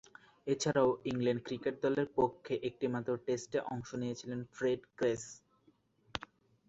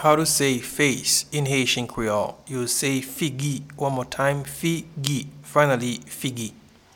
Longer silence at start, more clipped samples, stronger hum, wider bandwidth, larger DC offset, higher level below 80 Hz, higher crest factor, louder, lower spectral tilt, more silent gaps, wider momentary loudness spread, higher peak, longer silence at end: first, 0.45 s vs 0 s; neither; neither; second, 8.2 kHz vs 19 kHz; neither; second, -68 dBFS vs -54 dBFS; about the same, 24 dB vs 24 dB; second, -36 LUFS vs -23 LUFS; first, -5.5 dB/octave vs -3.5 dB/octave; neither; first, 13 LU vs 9 LU; second, -12 dBFS vs 0 dBFS; about the same, 0.5 s vs 0.45 s